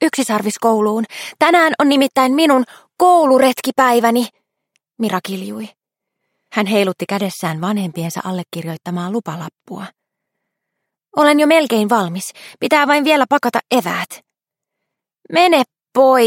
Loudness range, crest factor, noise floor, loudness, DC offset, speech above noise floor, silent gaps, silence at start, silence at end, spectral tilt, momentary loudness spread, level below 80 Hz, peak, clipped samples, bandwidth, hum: 9 LU; 16 dB; -82 dBFS; -15 LUFS; under 0.1%; 67 dB; none; 0 s; 0 s; -4.5 dB/octave; 14 LU; -66 dBFS; 0 dBFS; under 0.1%; 17 kHz; none